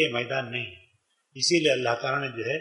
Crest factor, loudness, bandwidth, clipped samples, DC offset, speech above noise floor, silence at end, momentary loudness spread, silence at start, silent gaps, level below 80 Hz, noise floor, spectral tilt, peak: 18 dB; -26 LUFS; 11.5 kHz; under 0.1%; under 0.1%; 41 dB; 0 s; 11 LU; 0 s; none; -72 dBFS; -68 dBFS; -3.5 dB/octave; -8 dBFS